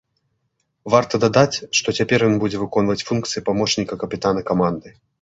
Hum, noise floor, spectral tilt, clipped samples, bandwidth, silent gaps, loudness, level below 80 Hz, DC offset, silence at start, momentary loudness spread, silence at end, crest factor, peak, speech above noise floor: none; -71 dBFS; -4.5 dB/octave; under 0.1%; 8 kHz; none; -19 LUFS; -50 dBFS; under 0.1%; 0.85 s; 6 LU; 0.3 s; 18 dB; -2 dBFS; 52 dB